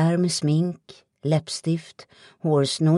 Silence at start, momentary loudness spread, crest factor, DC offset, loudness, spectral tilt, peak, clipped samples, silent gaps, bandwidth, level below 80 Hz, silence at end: 0 s; 9 LU; 14 dB; under 0.1%; -24 LUFS; -6 dB/octave; -10 dBFS; under 0.1%; none; 11.5 kHz; -66 dBFS; 0 s